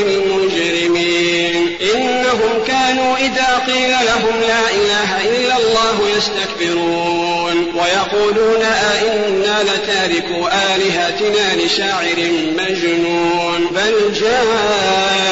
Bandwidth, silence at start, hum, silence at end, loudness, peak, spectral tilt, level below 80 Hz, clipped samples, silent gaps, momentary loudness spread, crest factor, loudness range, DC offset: 8 kHz; 0 s; none; 0 s; -14 LUFS; -4 dBFS; -3 dB/octave; -46 dBFS; under 0.1%; none; 3 LU; 10 dB; 1 LU; 0.2%